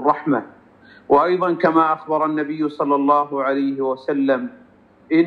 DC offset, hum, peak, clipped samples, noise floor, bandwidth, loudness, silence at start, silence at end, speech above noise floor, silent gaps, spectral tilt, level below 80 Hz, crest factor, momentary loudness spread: under 0.1%; none; -4 dBFS; under 0.1%; -48 dBFS; 5.2 kHz; -19 LUFS; 0 s; 0 s; 29 dB; none; -8.5 dB/octave; -64 dBFS; 16 dB; 7 LU